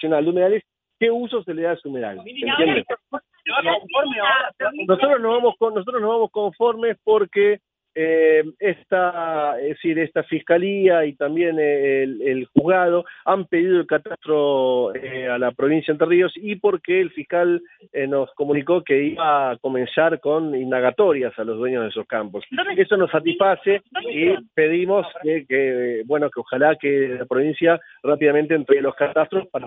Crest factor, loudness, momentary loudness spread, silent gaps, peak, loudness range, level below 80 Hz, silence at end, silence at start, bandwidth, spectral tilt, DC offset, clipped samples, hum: 18 dB; -20 LUFS; 7 LU; none; -2 dBFS; 2 LU; -66 dBFS; 0 s; 0 s; 4 kHz; -9 dB/octave; under 0.1%; under 0.1%; none